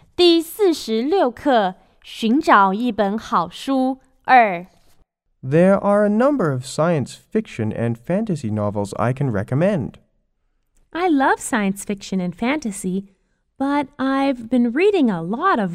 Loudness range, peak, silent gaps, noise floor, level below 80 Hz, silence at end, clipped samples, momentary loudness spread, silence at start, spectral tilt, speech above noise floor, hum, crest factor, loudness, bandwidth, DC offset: 5 LU; 0 dBFS; none; -67 dBFS; -54 dBFS; 0 s; under 0.1%; 10 LU; 0.2 s; -6 dB/octave; 48 dB; none; 18 dB; -19 LUFS; 16 kHz; under 0.1%